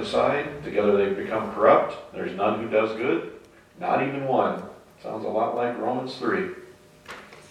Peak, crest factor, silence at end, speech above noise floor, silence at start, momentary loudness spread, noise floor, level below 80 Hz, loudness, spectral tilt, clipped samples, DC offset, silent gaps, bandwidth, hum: -4 dBFS; 22 dB; 0.05 s; 21 dB; 0 s; 19 LU; -45 dBFS; -60 dBFS; -25 LUFS; -6.5 dB/octave; under 0.1%; under 0.1%; none; 12 kHz; none